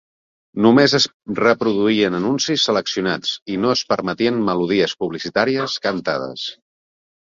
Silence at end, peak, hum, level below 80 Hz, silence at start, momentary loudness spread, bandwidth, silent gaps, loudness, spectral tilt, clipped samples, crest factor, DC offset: 0.85 s; -2 dBFS; none; -58 dBFS; 0.55 s; 9 LU; 7.6 kHz; 1.14-1.20 s, 3.42-3.46 s; -18 LUFS; -4.5 dB/octave; under 0.1%; 18 dB; under 0.1%